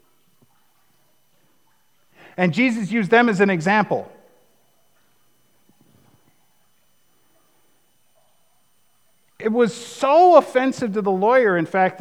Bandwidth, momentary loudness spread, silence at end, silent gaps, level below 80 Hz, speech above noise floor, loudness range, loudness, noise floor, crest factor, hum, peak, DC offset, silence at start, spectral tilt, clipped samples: 15 kHz; 11 LU; 0 s; none; -76 dBFS; 47 dB; 10 LU; -18 LUFS; -65 dBFS; 22 dB; none; 0 dBFS; 0.1%; 2.4 s; -6 dB/octave; under 0.1%